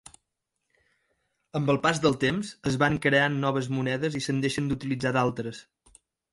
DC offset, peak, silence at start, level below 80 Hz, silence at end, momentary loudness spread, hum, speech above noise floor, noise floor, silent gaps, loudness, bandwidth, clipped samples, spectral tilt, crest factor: under 0.1%; -8 dBFS; 1.55 s; -56 dBFS; 0.7 s; 8 LU; none; 56 dB; -82 dBFS; none; -26 LUFS; 11.5 kHz; under 0.1%; -5.5 dB/octave; 20 dB